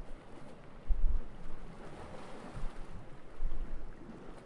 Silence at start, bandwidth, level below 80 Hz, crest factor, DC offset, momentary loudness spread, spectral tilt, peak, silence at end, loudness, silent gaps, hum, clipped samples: 0 s; 4.3 kHz; -38 dBFS; 18 dB; under 0.1%; 13 LU; -7 dB/octave; -16 dBFS; 0 s; -46 LUFS; none; none; under 0.1%